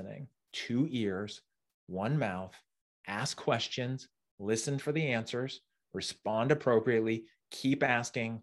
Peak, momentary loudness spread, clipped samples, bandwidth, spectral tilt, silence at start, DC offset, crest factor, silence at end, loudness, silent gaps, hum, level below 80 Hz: -12 dBFS; 16 LU; under 0.1%; 12.5 kHz; -5 dB/octave; 0 s; under 0.1%; 22 dB; 0 s; -33 LUFS; 1.74-1.87 s, 2.81-3.04 s, 4.31-4.38 s; none; -74 dBFS